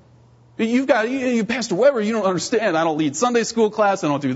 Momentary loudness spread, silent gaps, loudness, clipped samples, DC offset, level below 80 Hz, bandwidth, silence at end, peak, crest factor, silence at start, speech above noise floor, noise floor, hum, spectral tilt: 4 LU; none; -19 LUFS; under 0.1%; under 0.1%; -62 dBFS; 8 kHz; 0 s; -4 dBFS; 16 dB; 0.6 s; 32 dB; -51 dBFS; none; -4.5 dB/octave